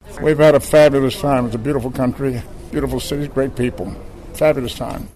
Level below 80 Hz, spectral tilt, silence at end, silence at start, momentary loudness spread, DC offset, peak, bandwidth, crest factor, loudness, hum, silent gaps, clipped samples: -36 dBFS; -6 dB/octave; 0.05 s; 0.05 s; 16 LU; 0.2%; -2 dBFS; 13.5 kHz; 14 dB; -17 LUFS; none; none; under 0.1%